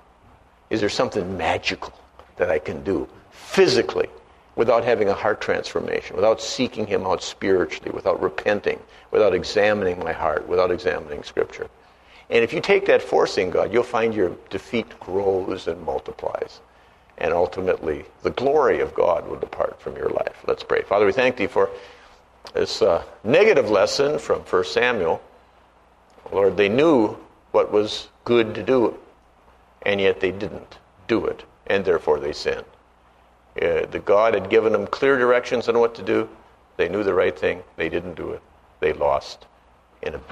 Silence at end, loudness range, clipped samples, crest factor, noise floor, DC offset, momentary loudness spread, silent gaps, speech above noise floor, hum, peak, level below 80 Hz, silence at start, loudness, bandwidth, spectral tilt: 0 s; 5 LU; under 0.1%; 20 dB; -55 dBFS; under 0.1%; 11 LU; none; 34 dB; none; -2 dBFS; -52 dBFS; 0.7 s; -22 LUFS; 11 kHz; -5 dB/octave